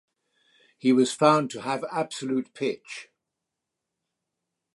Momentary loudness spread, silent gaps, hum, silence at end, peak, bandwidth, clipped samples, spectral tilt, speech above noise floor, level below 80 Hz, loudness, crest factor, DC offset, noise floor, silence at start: 14 LU; none; none; 1.7 s; -4 dBFS; 11.5 kHz; under 0.1%; -5 dB/octave; 60 dB; -80 dBFS; -25 LUFS; 24 dB; under 0.1%; -85 dBFS; 0.85 s